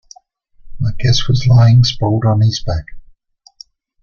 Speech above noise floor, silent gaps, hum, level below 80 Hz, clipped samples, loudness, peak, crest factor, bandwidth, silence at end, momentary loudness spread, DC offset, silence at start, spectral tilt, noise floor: 38 dB; none; none; -32 dBFS; under 0.1%; -13 LUFS; -2 dBFS; 14 dB; 7 kHz; 1 s; 13 LU; under 0.1%; 0.65 s; -6 dB/octave; -50 dBFS